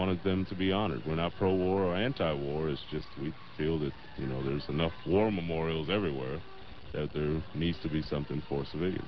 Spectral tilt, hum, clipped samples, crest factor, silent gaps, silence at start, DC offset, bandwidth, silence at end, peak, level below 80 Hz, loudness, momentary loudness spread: -5.5 dB/octave; none; under 0.1%; 18 dB; none; 0 s; 0.6%; 6 kHz; 0 s; -14 dBFS; -48 dBFS; -33 LUFS; 11 LU